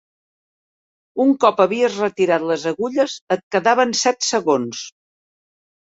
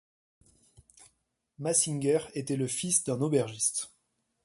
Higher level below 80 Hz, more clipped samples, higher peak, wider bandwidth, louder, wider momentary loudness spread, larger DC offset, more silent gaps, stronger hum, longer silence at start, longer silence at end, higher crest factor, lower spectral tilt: about the same, -66 dBFS vs -70 dBFS; neither; first, 0 dBFS vs -10 dBFS; second, 8 kHz vs 12 kHz; first, -18 LUFS vs -29 LUFS; about the same, 9 LU vs 9 LU; neither; first, 3.21-3.27 s, 3.43-3.51 s vs none; neither; first, 1.15 s vs 1 s; first, 1.05 s vs 0.55 s; about the same, 20 dB vs 22 dB; about the same, -3.5 dB/octave vs -4 dB/octave